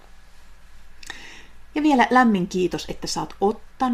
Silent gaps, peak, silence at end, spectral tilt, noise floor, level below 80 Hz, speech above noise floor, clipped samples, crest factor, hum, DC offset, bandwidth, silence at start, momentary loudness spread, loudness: none; -4 dBFS; 0 s; -5 dB/octave; -43 dBFS; -46 dBFS; 22 dB; under 0.1%; 20 dB; none; under 0.1%; 15.5 kHz; 0.15 s; 22 LU; -21 LUFS